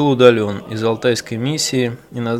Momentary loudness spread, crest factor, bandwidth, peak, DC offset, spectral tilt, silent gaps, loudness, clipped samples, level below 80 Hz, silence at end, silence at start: 11 LU; 16 dB; 15.5 kHz; 0 dBFS; under 0.1%; -5 dB/octave; none; -17 LUFS; under 0.1%; -56 dBFS; 0 s; 0 s